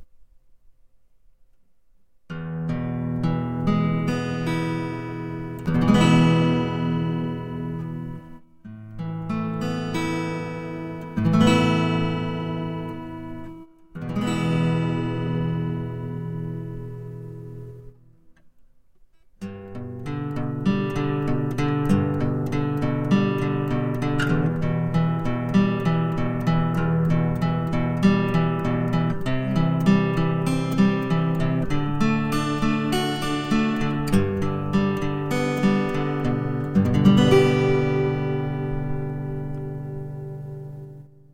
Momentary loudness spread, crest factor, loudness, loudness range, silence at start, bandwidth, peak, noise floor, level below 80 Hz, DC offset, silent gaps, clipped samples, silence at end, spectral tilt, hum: 15 LU; 20 dB; -23 LUFS; 9 LU; 0 s; 14.5 kHz; -4 dBFS; -62 dBFS; -40 dBFS; 0.2%; none; under 0.1%; 0.3 s; -7.5 dB/octave; none